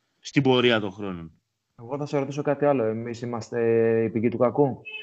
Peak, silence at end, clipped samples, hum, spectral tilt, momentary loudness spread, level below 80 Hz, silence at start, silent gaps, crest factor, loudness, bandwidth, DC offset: -6 dBFS; 0 s; under 0.1%; none; -6.5 dB/octave; 13 LU; -66 dBFS; 0.25 s; none; 18 dB; -24 LUFS; 8 kHz; under 0.1%